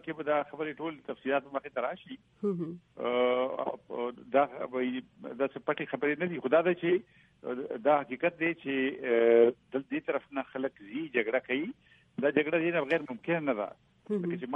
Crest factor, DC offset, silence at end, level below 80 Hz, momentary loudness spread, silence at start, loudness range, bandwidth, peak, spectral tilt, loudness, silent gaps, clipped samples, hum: 20 dB; under 0.1%; 0 s; -76 dBFS; 11 LU; 0.05 s; 4 LU; 5.4 kHz; -12 dBFS; -8.5 dB/octave; -31 LUFS; none; under 0.1%; none